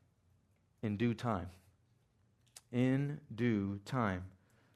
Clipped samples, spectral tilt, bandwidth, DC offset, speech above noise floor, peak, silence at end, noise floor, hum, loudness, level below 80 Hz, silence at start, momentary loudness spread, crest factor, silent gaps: under 0.1%; -7.5 dB/octave; 13 kHz; under 0.1%; 37 dB; -20 dBFS; 0.45 s; -73 dBFS; none; -37 LUFS; -74 dBFS; 0.85 s; 10 LU; 20 dB; none